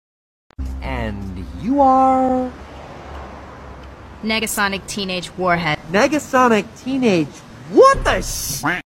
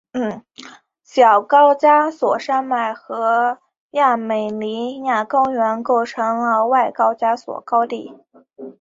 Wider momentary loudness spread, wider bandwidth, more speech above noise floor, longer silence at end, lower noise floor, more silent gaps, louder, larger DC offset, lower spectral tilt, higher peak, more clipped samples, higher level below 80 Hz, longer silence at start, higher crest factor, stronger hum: first, 23 LU vs 12 LU; first, 16.5 kHz vs 7.8 kHz; second, 20 dB vs 27 dB; about the same, 0.05 s vs 0.1 s; second, -37 dBFS vs -44 dBFS; second, none vs 3.80-3.89 s; about the same, -17 LUFS vs -17 LUFS; neither; about the same, -4.5 dB/octave vs -5 dB/octave; about the same, 0 dBFS vs -2 dBFS; neither; first, -34 dBFS vs -68 dBFS; first, 0.6 s vs 0.15 s; about the same, 18 dB vs 16 dB; neither